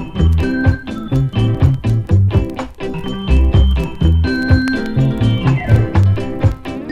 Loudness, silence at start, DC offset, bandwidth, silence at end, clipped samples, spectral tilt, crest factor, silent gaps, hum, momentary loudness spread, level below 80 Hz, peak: -15 LUFS; 0 s; under 0.1%; 8.4 kHz; 0 s; under 0.1%; -8 dB/octave; 14 dB; none; none; 10 LU; -20 dBFS; 0 dBFS